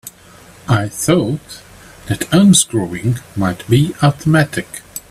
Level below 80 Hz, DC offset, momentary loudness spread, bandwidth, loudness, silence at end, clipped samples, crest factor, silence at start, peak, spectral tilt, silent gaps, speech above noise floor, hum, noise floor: -44 dBFS; under 0.1%; 18 LU; 15 kHz; -15 LUFS; 0.1 s; under 0.1%; 16 dB; 0.05 s; 0 dBFS; -5 dB/octave; none; 27 dB; none; -42 dBFS